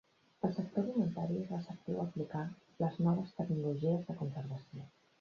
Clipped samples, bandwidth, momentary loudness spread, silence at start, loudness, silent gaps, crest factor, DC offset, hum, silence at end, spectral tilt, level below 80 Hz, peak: under 0.1%; 6.8 kHz; 11 LU; 0.45 s; -38 LUFS; none; 20 dB; under 0.1%; none; 0.3 s; -9.5 dB/octave; -72 dBFS; -18 dBFS